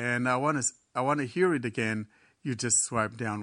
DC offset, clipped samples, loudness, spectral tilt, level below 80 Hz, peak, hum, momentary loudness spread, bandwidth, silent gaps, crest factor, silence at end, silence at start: under 0.1%; under 0.1%; -28 LUFS; -4 dB/octave; -66 dBFS; -12 dBFS; none; 11 LU; 10 kHz; none; 18 dB; 0 s; 0 s